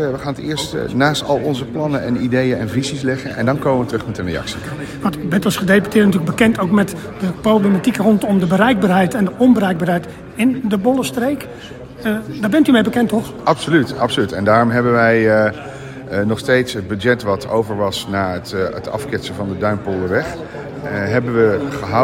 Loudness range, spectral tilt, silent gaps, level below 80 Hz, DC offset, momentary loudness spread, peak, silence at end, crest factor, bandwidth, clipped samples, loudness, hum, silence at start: 5 LU; -6 dB/octave; none; -46 dBFS; under 0.1%; 11 LU; 0 dBFS; 0 s; 16 dB; 16.5 kHz; under 0.1%; -17 LUFS; none; 0 s